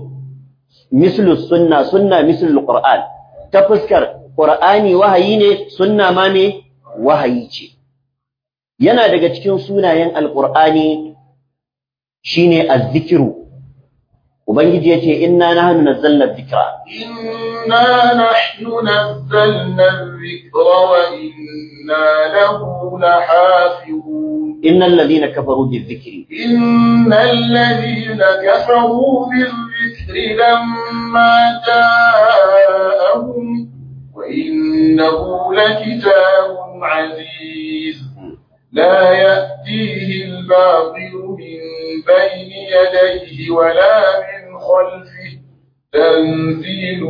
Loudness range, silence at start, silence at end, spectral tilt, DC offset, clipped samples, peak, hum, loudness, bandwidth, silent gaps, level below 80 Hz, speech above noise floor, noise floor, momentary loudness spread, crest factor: 4 LU; 0 s; 0 s; -7.5 dB/octave; under 0.1%; under 0.1%; 0 dBFS; none; -12 LUFS; 5.2 kHz; none; -50 dBFS; 77 dB; -89 dBFS; 16 LU; 12 dB